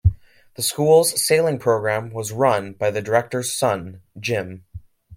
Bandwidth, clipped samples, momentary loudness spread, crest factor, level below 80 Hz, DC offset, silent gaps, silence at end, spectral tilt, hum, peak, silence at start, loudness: 16.5 kHz; under 0.1%; 13 LU; 18 dB; -40 dBFS; under 0.1%; none; 0 s; -4 dB/octave; none; -4 dBFS; 0.05 s; -20 LUFS